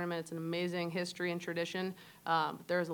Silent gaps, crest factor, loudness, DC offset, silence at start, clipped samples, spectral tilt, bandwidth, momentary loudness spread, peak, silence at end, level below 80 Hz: none; 18 dB; -37 LUFS; under 0.1%; 0 s; under 0.1%; -5 dB/octave; 19 kHz; 6 LU; -18 dBFS; 0 s; -82 dBFS